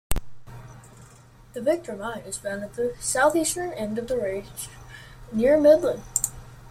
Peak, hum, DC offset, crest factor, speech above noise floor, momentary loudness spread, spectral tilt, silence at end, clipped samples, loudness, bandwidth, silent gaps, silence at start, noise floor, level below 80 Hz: -4 dBFS; none; under 0.1%; 20 dB; 26 dB; 26 LU; -4 dB/octave; 0 s; under 0.1%; -24 LUFS; 16.5 kHz; none; 0.1 s; -50 dBFS; -42 dBFS